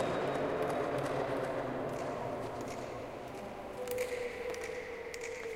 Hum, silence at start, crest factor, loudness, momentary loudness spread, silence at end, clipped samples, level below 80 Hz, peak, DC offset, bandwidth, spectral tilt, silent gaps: none; 0 s; 16 dB; -38 LUFS; 9 LU; 0 s; under 0.1%; -62 dBFS; -22 dBFS; under 0.1%; 16.5 kHz; -5 dB/octave; none